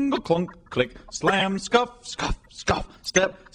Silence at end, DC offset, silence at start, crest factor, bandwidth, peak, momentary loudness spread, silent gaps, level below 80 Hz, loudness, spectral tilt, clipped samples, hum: 0.2 s; under 0.1%; 0 s; 20 dB; 12.5 kHz; -4 dBFS; 8 LU; none; -40 dBFS; -25 LUFS; -4 dB/octave; under 0.1%; none